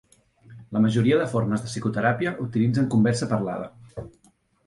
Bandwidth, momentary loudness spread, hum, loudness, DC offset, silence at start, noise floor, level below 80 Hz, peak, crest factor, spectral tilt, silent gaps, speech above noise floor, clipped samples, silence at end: 11.5 kHz; 15 LU; none; -24 LUFS; under 0.1%; 0.5 s; -62 dBFS; -56 dBFS; -8 dBFS; 16 dB; -7 dB/octave; none; 39 dB; under 0.1%; 0.6 s